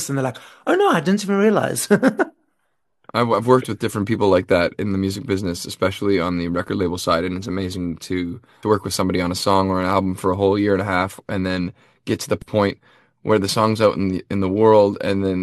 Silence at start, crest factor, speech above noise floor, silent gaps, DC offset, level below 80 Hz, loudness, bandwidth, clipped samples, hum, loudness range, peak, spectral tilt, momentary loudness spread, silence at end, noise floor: 0 s; 18 dB; 54 dB; none; under 0.1%; -52 dBFS; -20 LUFS; 13 kHz; under 0.1%; none; 3 LU; -2 dBFS; -5.5 dB/octave; 9 LU; 0 s; -73 dBFS